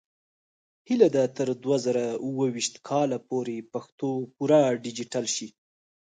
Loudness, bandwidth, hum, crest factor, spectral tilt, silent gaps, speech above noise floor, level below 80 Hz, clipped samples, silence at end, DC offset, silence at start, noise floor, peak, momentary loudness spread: -26 LUFS; 9.6 kHz; none; 22 dB; -5 dB/octave; 3.92-3.98 s; over 64 dB; -76 dBFS; under 0.1%; 0.65 s; under 0.1%; 0.9 s; under -90 dBFS; -6 dBFS; 10 LU